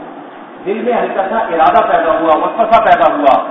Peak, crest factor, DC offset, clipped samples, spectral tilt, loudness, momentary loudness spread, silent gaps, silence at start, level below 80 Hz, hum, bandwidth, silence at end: 0 dBFS; 12 dB; under 0.1%; 0.3%; -7 dB/octave; -11 LUFS; 16 LU; none; 0 s; -46 dBFS; none; 5.4 kHz; 0 s